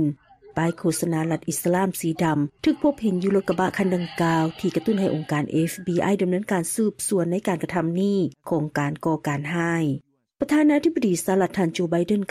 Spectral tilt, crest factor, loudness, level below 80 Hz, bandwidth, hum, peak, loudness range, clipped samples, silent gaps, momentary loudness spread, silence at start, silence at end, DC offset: -6 dB/octave; 12 dB; -23 LUFS; -58 dBFS; 15 kHz; none; -10 dBFS; 1 LU; under 0.1%; none; 4 LU; 0 s; 0.05 s; under 0.1%